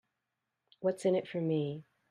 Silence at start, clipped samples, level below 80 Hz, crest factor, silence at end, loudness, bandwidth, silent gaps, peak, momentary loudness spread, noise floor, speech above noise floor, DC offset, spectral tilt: 0.8 s; under 0.1%; -82 dBFS; 16 dB; 0.3 s; -34 LUFS; 11.5 kHz; none; -20 dBFS; 8 LU; -87 dBFS; 54 dB; under 0.1%; -7 dB/octave